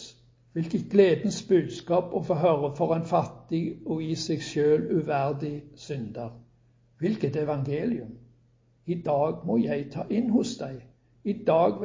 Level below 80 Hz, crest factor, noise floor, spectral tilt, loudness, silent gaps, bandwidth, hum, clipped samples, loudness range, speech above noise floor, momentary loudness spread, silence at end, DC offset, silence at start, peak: -60 dBFS; 20 dB; -63 dBFS; -7 dB/octave; -27 LUFS; none; 7.6 kHz; none; under 0.1%; 6 LU; 37 dB; 14 LU; 0 s; under 0.1%; 0 s; -8 dBFS